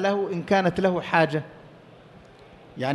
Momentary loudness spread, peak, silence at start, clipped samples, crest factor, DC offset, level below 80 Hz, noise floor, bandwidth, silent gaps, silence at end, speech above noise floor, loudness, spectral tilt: 14 LU; -6 dBFS; 0 s; under 0.1%; 20 dB; under 0.1%; -58 dBFS; -49 dBFS; 11.5 kHz; none; 0 s; 26 dB; -24 LUFS; -6.5 dB/octave